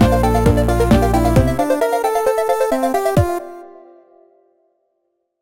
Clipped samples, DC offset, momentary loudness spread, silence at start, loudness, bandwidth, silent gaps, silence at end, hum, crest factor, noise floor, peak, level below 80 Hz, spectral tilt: under 0.1%; under 0.1%; 6 LU; 0 s; -16 LUFS; 17 kHz; none; 1.75 s; none; 14 dB; -70 dBFS; -2 dBFS; -26 dBFS; -7 dB/octave